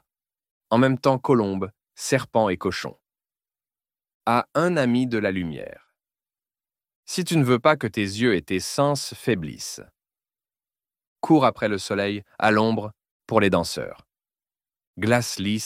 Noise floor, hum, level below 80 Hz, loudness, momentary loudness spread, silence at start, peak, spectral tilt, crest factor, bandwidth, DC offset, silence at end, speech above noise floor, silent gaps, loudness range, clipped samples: under -90 dBFS; none; -58 dBFS; -23 LUFS; 13 LU; 0.7 s; -4 dBFS; -5.5 dB/octave; 22 dB; 16 kHz; under 0.1%; 0 s; over 68 dB; 4.14-4.20 s, 6.95-7.03 s, 11.07-11.16 s, 13.11-13.20 s, 14.87-14.94 s; 3 LU; under 0.1%